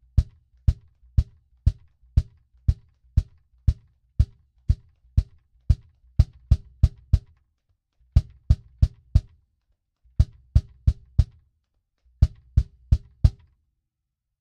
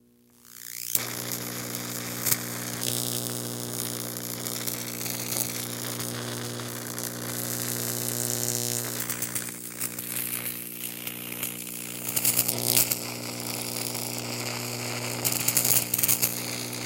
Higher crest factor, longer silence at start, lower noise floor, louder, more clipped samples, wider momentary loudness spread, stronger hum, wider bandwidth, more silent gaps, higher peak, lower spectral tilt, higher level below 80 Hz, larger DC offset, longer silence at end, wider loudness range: second, 22 dB vs 30 dB; second, 0.15 s vs 0.5 s; first, -82 dBFS vs -57 dBFS; about the same, -26 LUFS vs -27 LUFS; neither; about the same, 11 LU vs 11 LU; second, none vs 60 Hz at -40 dBFS; second, 6.8 kHz vs 17.5 kHz; neither; about the same, -2 dBFS vs 0 dBFS; first, -8.5 dB/octave vs -2 dB/octave; first, -28 dBFS vs -66 dBFS; neither; first, 1.1 s vs 0 s; about the same, 3 LU vs 5 LU